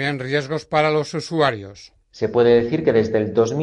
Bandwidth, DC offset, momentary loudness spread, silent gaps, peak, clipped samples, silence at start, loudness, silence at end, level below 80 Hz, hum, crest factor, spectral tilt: 10.5 kHz; under 0.1%; 9 LU; none; -4 dBFS; under 0.1%; 0 s; -19 LUFS; 0 s; -54 dBFS; none; 16 dB; -6 dB/octave